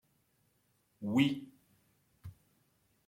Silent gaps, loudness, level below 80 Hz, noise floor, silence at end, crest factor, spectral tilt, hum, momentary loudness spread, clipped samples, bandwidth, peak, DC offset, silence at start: none; -33 LUFS; -74 dBFS; -75 dBFS; 0.75 s; 24 dB; -6 dB/octave; none; 24 LU; under 0.1%; 16 kHz; -16 dBFS; under 0.1%; 1 s